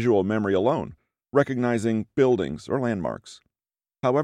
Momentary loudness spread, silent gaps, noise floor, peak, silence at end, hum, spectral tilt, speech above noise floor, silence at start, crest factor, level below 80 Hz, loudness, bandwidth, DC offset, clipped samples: 8 LU; none; under -90 dBFS; -6 dBFS; 0 s; none; -7.5 dB/octave; over 67 dB; 0 s; 18 dB; -58 dBFS; -24 LUFS; 11 kHz; under 0.1%; under 0.1%